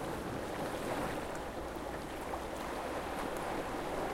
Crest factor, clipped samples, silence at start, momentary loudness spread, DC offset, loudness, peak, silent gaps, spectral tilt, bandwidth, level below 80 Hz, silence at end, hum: 14 dB; under 0.1%; 0 s; 4 LU; under 0.1%; -39 LUFS; -24 dBFS; none; -5 dB/octave; 16.5 kHz; -52 dBFS; 0 s; none